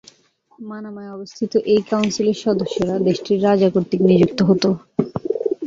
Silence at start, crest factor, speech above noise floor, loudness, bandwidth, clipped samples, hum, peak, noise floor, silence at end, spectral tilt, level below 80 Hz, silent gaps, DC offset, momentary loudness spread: 0.6 s; 16 dB; 38 dB; -18 LUFS; 7.6 kHz; under 0.1%; none; -2 dBFS; -56 dBFS; 0 s; -6.5 dB/octave; -54 dBFS; none; under 0.1%; 17 LU